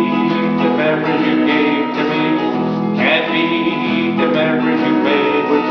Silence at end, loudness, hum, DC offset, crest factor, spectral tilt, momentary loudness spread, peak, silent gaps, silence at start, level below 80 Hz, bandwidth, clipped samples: 0 s; -15 LUFS; none; under 0.1%; 14 dB; -7.5 dB/octave; 3 LU; -2 dBFS; none; 0 s; -58 dBFS; 5.4 kHz; under 0.1%